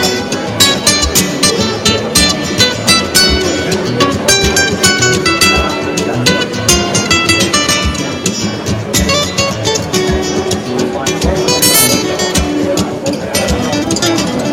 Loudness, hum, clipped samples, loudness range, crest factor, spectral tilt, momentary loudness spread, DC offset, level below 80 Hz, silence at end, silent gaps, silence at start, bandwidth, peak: -11 LUFS; none; 0.1%; 3 LU; 12 dB; -3 dB/octave; 7 LU; under 0.1%; -28 dBFS; 0 s; none; 0 s; over 20 kHz; 0 dBFS